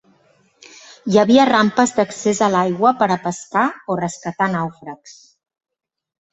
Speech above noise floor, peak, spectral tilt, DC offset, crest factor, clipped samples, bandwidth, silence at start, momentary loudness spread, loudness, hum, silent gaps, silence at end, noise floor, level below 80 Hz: 40 dB; 0 dBFS; -5 dB/octave; under 0.1%; 18 dB; under 0.1%; 8.2 kHz; 1.05 s; 15 LU; -17 LUFS; none; none; 1.2 s; -57 dBFS; -60 dBFS